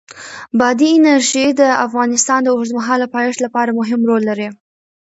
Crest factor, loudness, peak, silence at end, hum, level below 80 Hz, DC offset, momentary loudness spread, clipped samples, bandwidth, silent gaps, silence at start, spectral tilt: 14 dB; -14 LUFS; 0 dBFS; 0.5 s; none; -62 dBFS; under 0.1%; 9 LU; under 0.1%; 8.2 kHz; none; 0.15 s; -3 dB/octave